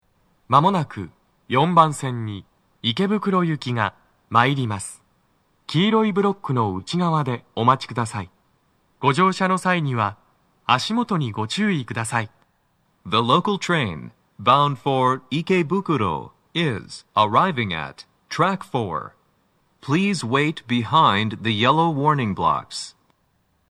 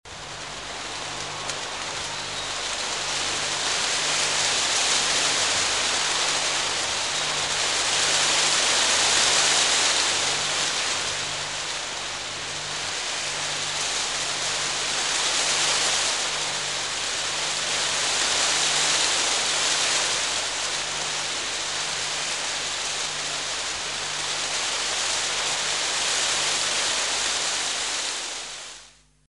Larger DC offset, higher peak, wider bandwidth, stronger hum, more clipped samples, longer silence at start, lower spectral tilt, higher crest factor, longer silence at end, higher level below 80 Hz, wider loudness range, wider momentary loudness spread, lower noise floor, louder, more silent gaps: second, under 0.1% vs 0.2%; first, 0 dBFS vs -6 dBFS; first, 13 kHz vs 11.5 kHz; second, none vs 50 Hz at -50 dBFS; neither; first, 0.5 s vs 0.05 s; first, -5.5 dB/octave vs 1 dB/octave; about the same, 22 dB vs 20 dB; first, 0.8 s vs 0.4 s; about the same, -60 dBFS vs -56 dBFS; second, 3 LU vs 6 LU; first, 14 LU vs 10 LU; first, -66 dBFS vs -51 dBFS; about the same, -21 LUFS vs -22 LUFS; neither